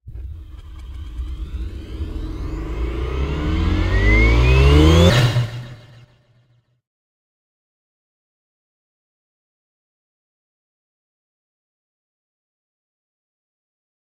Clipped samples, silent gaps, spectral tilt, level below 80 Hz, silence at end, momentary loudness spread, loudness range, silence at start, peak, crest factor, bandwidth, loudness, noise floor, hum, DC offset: under 0.1%; none; -6.5 dB/octave; -26 dBFS; 8.25 s; 23 LU; 13 LU; 0.05 s; 0 dBFS; 20 dB; 15 kHz; -17 LUFS; -59 dBFS; none; under 0.1%